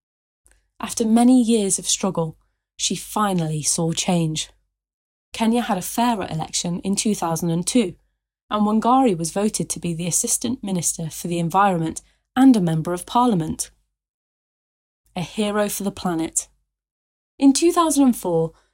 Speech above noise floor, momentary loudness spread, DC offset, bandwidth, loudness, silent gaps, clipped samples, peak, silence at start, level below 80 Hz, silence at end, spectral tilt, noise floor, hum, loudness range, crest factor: over 70 dB; 11 LU; under 0.1%; 16.5 kHz; -20 LUFS; 4.94-5.32 s, 8.42-8.48 s, 14.09-15.04 s, 16.91-17.38 s; under 0.1%; -6 dBFS; 0.8 s; -54 dBFS; 0.25 s; -4.5 dB/octave; under -90 dBFS; none; 5 LU; 16 dB